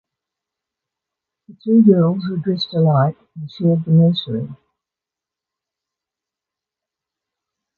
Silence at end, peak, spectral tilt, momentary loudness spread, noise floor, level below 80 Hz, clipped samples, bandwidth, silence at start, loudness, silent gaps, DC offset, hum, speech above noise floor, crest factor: 3.25 s; -2 dBFS; -10 dB/octave; 17 LU; -87 dBFS; -60 dBFS; under 0.1%; 4.8 kHz; 1.65 s; -16 LUFS; none; under 0.1%; none; 71 dB; 18 dB